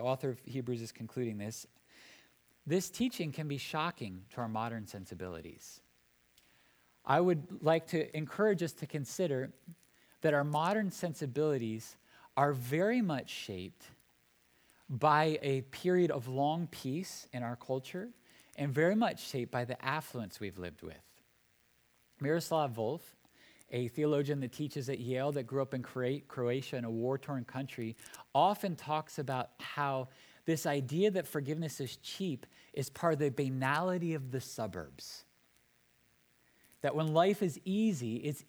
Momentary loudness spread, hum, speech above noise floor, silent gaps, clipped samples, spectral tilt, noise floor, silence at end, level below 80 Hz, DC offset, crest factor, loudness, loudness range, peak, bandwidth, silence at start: 14 LU; none; 36 dB; none; under 0.1%; -6 dB/octave; -71 dBFS; 0.05 s; -74 dBFS; under 0.1%; 22 dB; -35 LUFS; 5 LU; -14 dBFS; over 20 kHz; 0 s